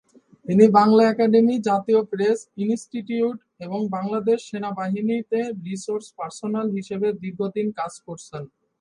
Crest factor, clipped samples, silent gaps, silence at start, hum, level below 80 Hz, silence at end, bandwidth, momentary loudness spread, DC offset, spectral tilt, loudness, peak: 20 dB; under 0.1%; none; 0.45 s; none; -68 dBFS; 0.35 s; 10.5 kHz; 15 LU; under 0.1%; -7 dB/octave; -22 LUFS; -2 dBFS